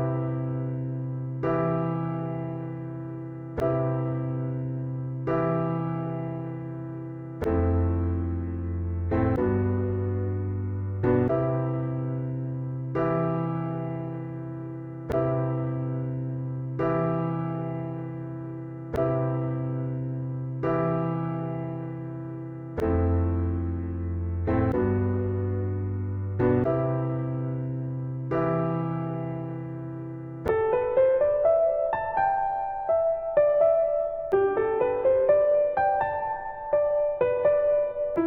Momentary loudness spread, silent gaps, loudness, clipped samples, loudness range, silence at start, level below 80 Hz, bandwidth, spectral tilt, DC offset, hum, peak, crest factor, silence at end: 12 LU; none; -27 LUFS; under 0.1%; 6 LU; 0 s; -46 dBFS; 4.3 kHz; -11 dB/octave; under 0.1%; none; -10 dBFS; 16 dB; 0 s